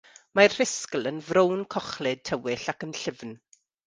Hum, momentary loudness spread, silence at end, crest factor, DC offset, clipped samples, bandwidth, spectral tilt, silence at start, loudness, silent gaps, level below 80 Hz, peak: none; 13 LU; 0.5 s; 24 dB; under 0.1%; under 0.1%; 10 kHz; -3.5 dB/octave; 0.35 s; -26 LUFS; none; -66 dBFS; -2 dBFS